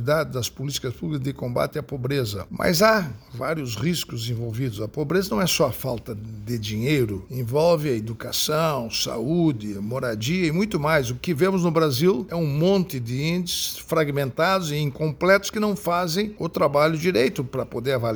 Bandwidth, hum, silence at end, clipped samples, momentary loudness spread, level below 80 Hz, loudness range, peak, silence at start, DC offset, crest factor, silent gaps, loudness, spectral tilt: over 20 kHz; none; 0 s; under 0.1%; 9 LU; -50 dBFS; 3 LU; -4 dBFS; 0 s; under 0.1%; 20 dB; none; -23 LUFS; -5 dB/octave